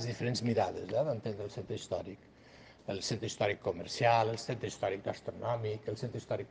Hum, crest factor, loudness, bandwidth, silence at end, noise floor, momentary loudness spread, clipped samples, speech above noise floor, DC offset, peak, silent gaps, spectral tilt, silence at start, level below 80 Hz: none; 22 dB; -35 LUFS; 9.8 kHz; 0.05 s; -57 dBFS; 11 LU; under 0.1%; 22 dB; under 0.1%; -14 dBFS; none; -5 dB/octave; 0 s; -66 dBFS